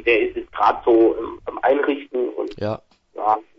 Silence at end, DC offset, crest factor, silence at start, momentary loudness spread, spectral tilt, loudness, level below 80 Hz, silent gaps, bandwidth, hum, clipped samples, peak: 0.15 s; under 0.1%; 18 dB; 0 s; 12 LU; -7.5 dB/octave; -20 LUFS; -52 dBFS; none; 6 kHz; none; under 0.1%; -2 dBFS